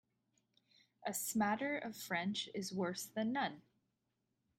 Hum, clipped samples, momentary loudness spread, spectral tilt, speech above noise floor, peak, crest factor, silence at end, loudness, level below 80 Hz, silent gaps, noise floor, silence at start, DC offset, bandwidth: none; under 0.1%; 7 LU; -3.5 dB/octave; 46 dB; -24 dBFS; 18 dB; 1 s; -40 LUFS; -82 dBFS; none; -86 dBFS; 1 s; under 0.1%; 16 kHz